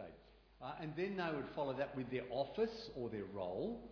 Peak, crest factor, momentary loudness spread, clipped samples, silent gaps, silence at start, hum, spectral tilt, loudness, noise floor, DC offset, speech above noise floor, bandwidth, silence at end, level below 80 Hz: -26 dBFS; 18 dB; 7 LU; under 0.1%; none; 0 s; none; -5 dB/octave; -43 LUFS; -64 dBFS; under 0.1%; 21 dB; 5.4 kHz; 0 s; -68 dBFS